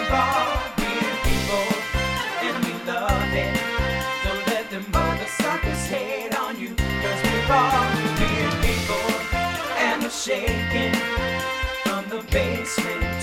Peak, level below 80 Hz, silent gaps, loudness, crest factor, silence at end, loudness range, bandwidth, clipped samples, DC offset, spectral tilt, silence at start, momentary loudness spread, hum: -6 dBFS; -32 dBFS; none; -23 LUFS; 16 dB; 0 s; 2 LU; 19 kHz; under 0.1%; under 0.1%; -4.5 dB/octave; 0 s; 5 LU; none